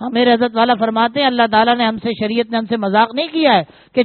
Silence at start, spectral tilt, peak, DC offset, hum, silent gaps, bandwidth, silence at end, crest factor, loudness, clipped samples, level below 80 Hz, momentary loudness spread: 0 s; -2 dB/octave; 0 dBFS; under 0.1%; none; none; 4.5 kHz; 0 s; 16 dB; -15 LUFS; under 0.1%; -58 dBFS; 6 LU